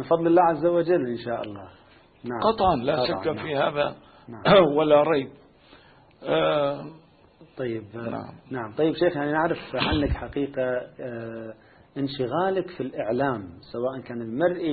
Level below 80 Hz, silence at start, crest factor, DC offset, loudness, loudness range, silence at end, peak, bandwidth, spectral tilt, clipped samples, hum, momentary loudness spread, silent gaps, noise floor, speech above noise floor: -46 dBFS; 0 s; 20 dB; under 0.1%; -25 LUFS; 7 LU; 0 s; -6 dBFS; 4.8 kHz; -10.5 dB/octave; under 0.1%; none; 17 LU; none; -53 dBFS; 29 dB